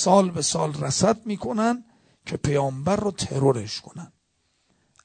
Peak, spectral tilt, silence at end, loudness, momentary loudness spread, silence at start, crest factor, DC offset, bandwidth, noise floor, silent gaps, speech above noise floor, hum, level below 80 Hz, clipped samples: -4 dBFS; -5 dB/octave; 1 s; -24 LUFS; 13 LU; 0 s; 20 dB; under 0.1%; 9.4 kHz; -70 dBFS; none; 47 dB; none; -52 dBFS; under 0.1%